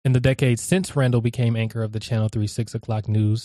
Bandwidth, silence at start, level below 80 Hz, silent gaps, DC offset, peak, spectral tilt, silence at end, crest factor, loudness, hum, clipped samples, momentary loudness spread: 13 kHz; 0.05 s; -48 dBFS; none; under 0.1%; -6 dBFS; -6.5 dB/octave; 0 s; 16 dB; -22 LUFS; none; under 0.1%; 7 LU